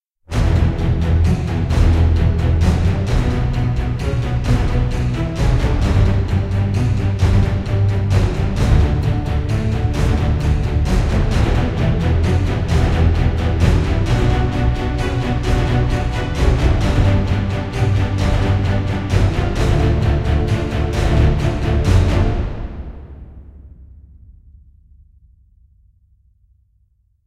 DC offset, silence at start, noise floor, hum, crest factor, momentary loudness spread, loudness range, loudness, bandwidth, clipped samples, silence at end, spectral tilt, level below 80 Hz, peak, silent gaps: under 0.1%; 0.3 s; -59 dBFS; none; 16 dB; 4 LU; 2 LU; -17 LUFS; 11.5 kHz; under 0.1%; 3.4 s; -7.5 dB/octave; -20 dBFS; 0 dBFS; none